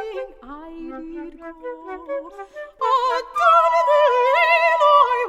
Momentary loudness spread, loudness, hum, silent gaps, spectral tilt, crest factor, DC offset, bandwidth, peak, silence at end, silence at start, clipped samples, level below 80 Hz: 22 LU; -16 LUFS; none; none; -2 dB/octave; 16 dB; under 0.1%; 13.5 kHz; -2 dBFS; 0 s; 0 s; under 0.1%; -54 dBFS